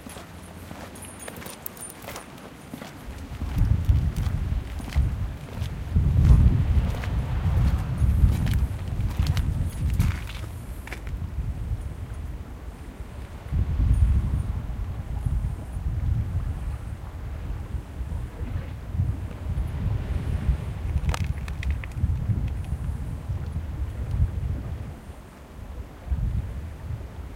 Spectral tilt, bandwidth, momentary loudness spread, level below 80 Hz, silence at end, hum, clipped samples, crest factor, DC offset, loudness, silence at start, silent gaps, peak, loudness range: -7 dB/octave; 17 kHz; 16 LU; -28 dBFS; 0 s; none; under 0.1%; 22 dB; under 0.1%; -28 LUFS; 0 s; none; -4 dBFS; 9 LU